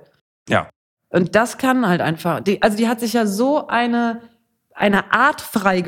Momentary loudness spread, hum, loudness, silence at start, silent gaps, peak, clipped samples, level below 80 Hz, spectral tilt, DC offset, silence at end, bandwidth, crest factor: 5 LU; none; -18 LUFS; 0.45 s; 0.76-0.97 s; 0 dBFS; under 0.1%; -54 dBFS; -5.5 dB/octave; under 0.1%; 0 s; 17.5 kHz; 18 dB